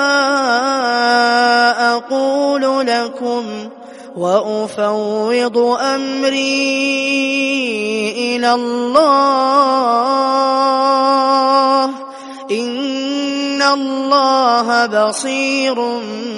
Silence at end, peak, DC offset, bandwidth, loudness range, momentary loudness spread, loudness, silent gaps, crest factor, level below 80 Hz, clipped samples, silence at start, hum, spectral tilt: 0 s; 0 dBFS; under 0.1%; 11.5 kHz; 4 LU; 8 LU; -14 LUFS; none; 14 dB; -66 dBFS; under 0.1%; 0 s; none; -3 dB/octave